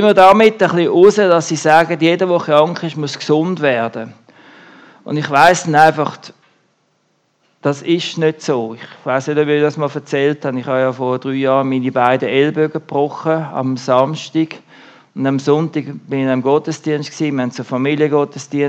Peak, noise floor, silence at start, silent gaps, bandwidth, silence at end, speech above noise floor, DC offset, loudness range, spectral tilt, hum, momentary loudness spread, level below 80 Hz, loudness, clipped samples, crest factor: 0 dBFS; -62 dBFS; 0 s; none; 12 kHz; 0 s; 48 dB; under 0.1%; 5 LU; -5.5 dB/octave; none; 11 LU; -58 dBFS; -15 LUFS; 0.2%; 14 dB